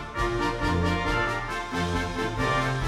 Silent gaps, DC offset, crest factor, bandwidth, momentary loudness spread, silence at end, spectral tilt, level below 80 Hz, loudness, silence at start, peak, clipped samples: none; under 0.1%; 14 dB; 15 kHz; 4 LU; 0 s; -5.5 dB/octave; -36 dBFS; -27 LUFS; 0 s; -12 dBFS; under 0.1%